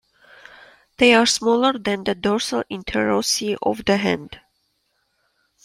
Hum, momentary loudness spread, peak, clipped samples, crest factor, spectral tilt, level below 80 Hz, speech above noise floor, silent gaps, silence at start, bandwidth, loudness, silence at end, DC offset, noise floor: none; 10 LU; -2 dBFS; under 0.1%; 20 dB; -3 dB/octave; -52 dBFS; 50 dB; none; 1 s; 15.5 kHz; -19 LUFS; 1.3 s; under 0.1%; -69 dBFS